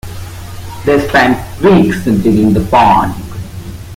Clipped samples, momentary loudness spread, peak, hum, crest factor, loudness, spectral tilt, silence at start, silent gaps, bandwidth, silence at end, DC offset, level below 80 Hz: under 0.1%; 19 LU; 0 dBFS; none; 12 dB; -10 LUFS; -6.5 dB/octave; 0.05 s; none; 16.5 kHz; 0 s; under 0.1%; -30 dBFS